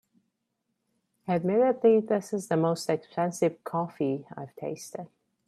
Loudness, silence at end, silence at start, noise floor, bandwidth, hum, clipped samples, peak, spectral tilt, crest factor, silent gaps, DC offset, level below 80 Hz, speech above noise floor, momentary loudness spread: -28 LUFS; 0.4 s; 1.25 s; -80 dBFS; 13.5 kHz; none; under 0.1%; -10 dBFS; -6.5 dB/octave; 18 dB; none; under 0.1%; -74 dBFS; 53 dB; 18 LU